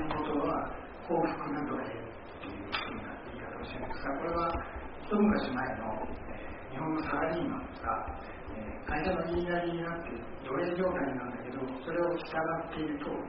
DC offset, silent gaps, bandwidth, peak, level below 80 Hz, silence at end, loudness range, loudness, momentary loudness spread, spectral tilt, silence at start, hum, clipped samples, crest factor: under 0.1%; none; 5.2 kHz; -16 dBFS; -50 dBFS; 0 s; 3 LU; -35 LUFS; 11 LU; -5 dB/octave; 0 s; none; under 0.1%; 18 dB